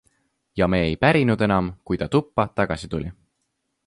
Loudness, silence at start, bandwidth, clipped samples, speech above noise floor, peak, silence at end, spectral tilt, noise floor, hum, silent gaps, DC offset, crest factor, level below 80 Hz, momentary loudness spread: -22 LUFS; 0.55 s; 11.5 kHz; under 0.1%; 54 dB; -4 dBFS; 0.75 s; -7.5 dB/octave; -75 dBFS; none; none; under 0.1%; 20 dB; -42 dBFS; 12 LU